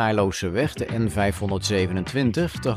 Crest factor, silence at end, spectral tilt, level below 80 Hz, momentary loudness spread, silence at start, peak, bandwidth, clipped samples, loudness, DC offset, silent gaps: 14 dB; 0 s; -5.5 dB/octave; -44 dBFS; 3 LU; 0 s; -8 dBFS; 15.5 kHz; under 0.1%; -24 LUFS; under 0.1%; none